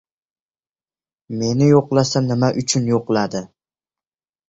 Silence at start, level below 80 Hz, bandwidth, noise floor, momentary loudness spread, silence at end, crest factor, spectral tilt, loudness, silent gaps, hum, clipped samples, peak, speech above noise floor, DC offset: 1.3 s; -54 dBFS; 8 kHz; under -90 dBFS; 11 LU; 1 s; 18 dB; -5.5 dB/octave; -18 LUFS; none; none; under 0.1%; -2 dBFS; over 73 dB; under 0.1%